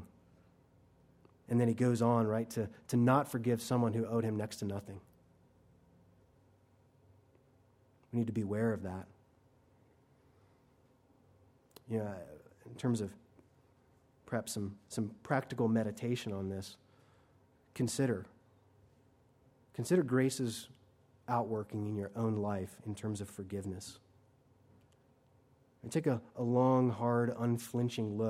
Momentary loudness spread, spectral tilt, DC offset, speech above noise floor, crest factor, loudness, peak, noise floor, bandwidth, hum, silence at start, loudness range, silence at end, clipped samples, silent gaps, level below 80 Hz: 16 LU; -6.5 dB/octave; under 0.1%; 34 dB; 22 dB; -35 LUFS; -14 dBFS; -68 dBFS; 15.5 kHz; none; 0 s; 12 LU; 0 s; under 0.1%; none; -74 dBFS